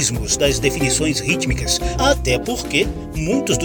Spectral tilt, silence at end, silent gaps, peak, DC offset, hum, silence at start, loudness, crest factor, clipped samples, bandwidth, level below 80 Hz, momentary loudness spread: -3.5 dB/octave; 0 s; none; -2 dBFS; under 0.1%; none; 0 s; -18 LUFS; 16 dB; under 0.1%; 19 kHz; -28 dBFS; 4 LU